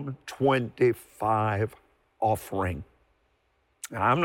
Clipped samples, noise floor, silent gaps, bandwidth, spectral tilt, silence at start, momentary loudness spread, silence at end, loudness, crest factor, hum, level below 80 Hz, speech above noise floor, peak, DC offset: under 0.1%; -70 dBFS; none; 17 kHz; -6.5 dB/octave; 0 s; 13 LU; 0 s; -28 LUFS; 16 dB; none; -58 dBFS; 44 dB; -12 dBFS; under 0.1%